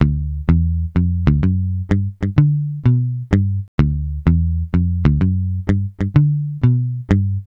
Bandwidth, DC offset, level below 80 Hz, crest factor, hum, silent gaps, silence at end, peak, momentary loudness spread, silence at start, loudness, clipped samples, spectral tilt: 5.8 kHz; under 0.1%; -26 dBFS; 16 dB; none; 3.68-3.78 s; 0.1 s; 0 dBFS; 4 LU; 0 s; -18 LUFS; under 0.1%; -10 dB/octave